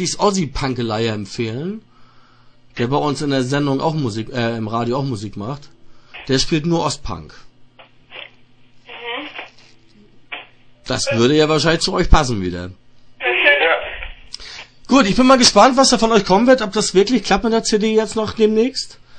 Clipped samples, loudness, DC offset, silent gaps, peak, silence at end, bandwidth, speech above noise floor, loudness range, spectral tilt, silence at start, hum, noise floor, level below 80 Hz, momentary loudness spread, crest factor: under 0.1%; -16 LUFS; 0.2%; none; 0 dBFS; 0 s; 9.4 kHz; 32 dB; 13 LU; -4 dB/octave; 0 s; none; -48 dBFS; -32 dBFS; 20 LU; 18 dB